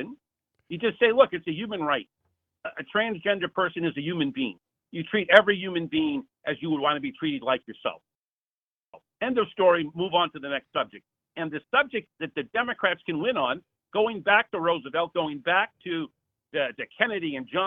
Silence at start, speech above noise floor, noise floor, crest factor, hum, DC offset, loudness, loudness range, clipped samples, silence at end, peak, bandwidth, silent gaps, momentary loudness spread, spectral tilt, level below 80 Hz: 0 s; over 64 dB; under -90 dBFS; 26 dB; none; under 0.1%; -26 LUFS; 4 LU; under 0.1%; 0 s; 0 dBFS; 6.2 kHz; 8.15-8.93 s; 12 LU; -7 dB/octave; -70 dBFS